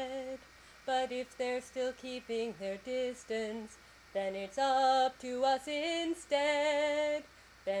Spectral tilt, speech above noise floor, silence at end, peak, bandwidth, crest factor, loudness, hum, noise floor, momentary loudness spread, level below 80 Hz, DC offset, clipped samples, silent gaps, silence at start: -3 dB/octave; 23 dB; 0 s; -20 dBFS; 13.5 kHz; 16 dB; -34 LUFS; none; -57 dBFS; 12 LU; -68 dBFS; under 0.1%; under 0.1%; none; 0 s